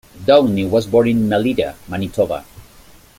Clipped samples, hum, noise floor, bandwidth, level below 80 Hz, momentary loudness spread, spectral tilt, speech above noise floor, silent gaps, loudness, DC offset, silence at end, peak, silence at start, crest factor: under 0.1%; none; -45 dBFS; 16.5 kHz; -46 dBFS; 11 LU; -7 dB/octave; 29 dB; none; -16 LUFS; under 0.1%; 0.55 s; 0 dBFS; 0.15 s; 16 dB